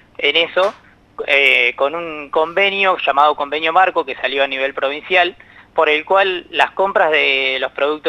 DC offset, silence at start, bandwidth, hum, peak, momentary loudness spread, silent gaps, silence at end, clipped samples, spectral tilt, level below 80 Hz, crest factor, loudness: under 0.1%; 0.2 s; 13 kHz; none; 0 dBFS; 7 LU; none; 0 s; under 0.1%; -3.5 dB/octave; -58 dBFS; 16 dB; -15 LUFS